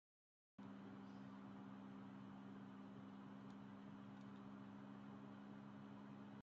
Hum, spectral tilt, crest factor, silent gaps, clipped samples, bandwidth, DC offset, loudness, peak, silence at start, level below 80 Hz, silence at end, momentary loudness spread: none; -6.5 dB/octave; 12 dB; none; under 0.1%; 7.4 kHz; under 0.1%; -58 LUFS; -46 dBFS; 0.6 s; -90 dBFS; 0 s; 1 LU